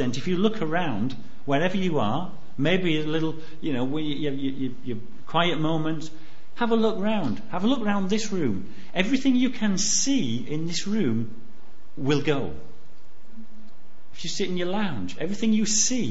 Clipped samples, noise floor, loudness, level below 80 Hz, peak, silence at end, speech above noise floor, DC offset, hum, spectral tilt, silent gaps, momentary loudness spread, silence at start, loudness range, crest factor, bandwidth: under 0.1%; -56 dBFS; -26 LUFS; -56 dBFS; -6 dBFS; 0 s; 31 dB; 6%; none; -4 dB/octave; none; 11 LU; 0 s; 5 LU; 20 dB; 8 kHz